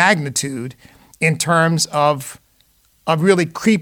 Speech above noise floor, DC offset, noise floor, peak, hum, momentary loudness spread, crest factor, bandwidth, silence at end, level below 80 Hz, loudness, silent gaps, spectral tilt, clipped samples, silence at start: 40 dB; under 0.1%; -57 dBFS; -2 dBFS; none; 14 LU; 16 dB; 18.5 kHz; 0 s; -58 dBFS; -17 LUFS; none; -4.5 dB/octave; under 0.1%; 0 s